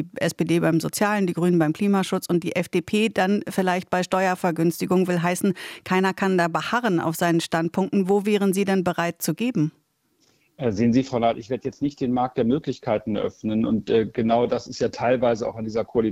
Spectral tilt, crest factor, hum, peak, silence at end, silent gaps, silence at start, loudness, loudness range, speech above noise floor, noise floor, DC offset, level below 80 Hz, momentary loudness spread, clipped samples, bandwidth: -6 dB/octave; 16 dB; none; -6 dBFS; 0 s; none; 0 s; -23 LUFS; 2 LU; 43 dB; -65 dBFS; under 0.1%; -58 dBFS; 6 LU; under 0.1%; 16.5 kHz